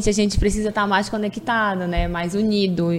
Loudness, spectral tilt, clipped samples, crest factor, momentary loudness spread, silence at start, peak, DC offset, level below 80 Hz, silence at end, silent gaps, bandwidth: -21 LUFS; -5 dB/octave; under 0.1%; 16 dB; 4 LU; 0 s; -4 dBFS; under 0.1%; -30 dBFS; 0 s; none; 13 kHz